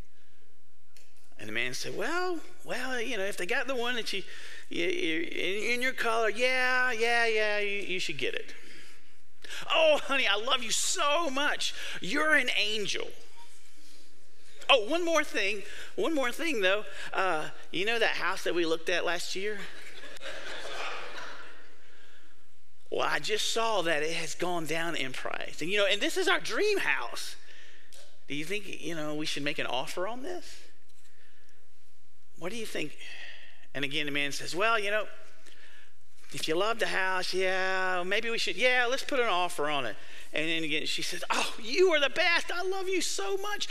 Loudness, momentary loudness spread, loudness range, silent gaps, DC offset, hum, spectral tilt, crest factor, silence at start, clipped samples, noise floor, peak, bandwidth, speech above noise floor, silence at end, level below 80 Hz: -29 LUFS; 15 LU; 8 LU; none; 3%; none; -2 dB/octave; 24 dB; 1.4 s; under 0.1%; -68 dBFS; -8 dBFS; 15.5 kHz; 38 dB; 0 s; -66 dBFS